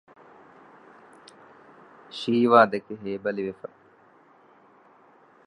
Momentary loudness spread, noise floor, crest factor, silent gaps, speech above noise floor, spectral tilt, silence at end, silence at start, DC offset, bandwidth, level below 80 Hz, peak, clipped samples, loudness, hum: 23 LU; -57 dBFS; 26 dB; none; 34 dB; -6.5 dB/octave; 1.95 s; 2.15 s; under 0.1%; 10.5 kHz; -74 dBFS; -4 dBFS; under 0.1%; -23 LUFS; none